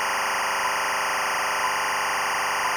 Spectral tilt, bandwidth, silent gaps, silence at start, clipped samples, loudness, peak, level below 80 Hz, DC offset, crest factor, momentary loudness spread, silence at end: 0 dB/octave; over 20 kHz; none; 0 s; under 0.1%; -24 LUFS; -18 dBFS; -62 dBFS; under 0.1%; 6 dB; 0 LU; 0 s